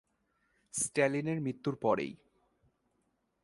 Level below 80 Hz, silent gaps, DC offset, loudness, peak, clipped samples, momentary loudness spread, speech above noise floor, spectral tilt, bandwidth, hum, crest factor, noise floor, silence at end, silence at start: -72 dBFS; none; under 0.1%; -33 LUFS; -14 dBFS; under 0.1%; 8 LU; 46 dB; -5 dB/octave; 11.5 kHz; none; 22 dB; -78 dBFS; 1.3 s; 0.75 s